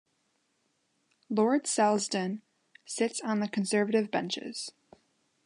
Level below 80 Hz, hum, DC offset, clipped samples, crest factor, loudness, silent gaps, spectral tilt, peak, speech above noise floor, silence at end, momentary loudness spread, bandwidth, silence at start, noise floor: -82 dBFS; none; under 0.1%; under 0.1%; 20 dB; -30 LUFS; none; -4 dB/octave; -12 dBFS; 46 dB; 0.75 s; 13 LU; 11.5 kHz; 1.3 s; -75 dBFS